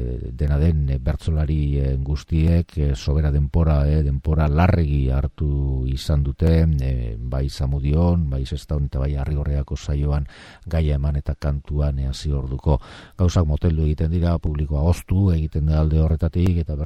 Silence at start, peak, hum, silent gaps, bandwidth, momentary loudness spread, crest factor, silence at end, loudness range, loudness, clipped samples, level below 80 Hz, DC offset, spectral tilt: 0 s; -4 dBFS; none; none; 9.2 kHz; 7 LU; 16 dB; 0 s; 4 LU; -22 LUFS; under 0.1%; -24 dBFS; under 0.1%; -8 dB/octave